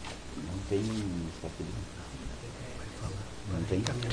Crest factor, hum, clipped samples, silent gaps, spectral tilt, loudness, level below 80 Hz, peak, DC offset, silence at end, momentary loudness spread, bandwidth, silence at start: 26 dB; none; under 0.1%; none; -5.5 dB/octave; -37 LUFS; -46 dBFS; -10 dBFS; under 0.1%; 0 s; 11 LU; 10.5 kHz; 0 s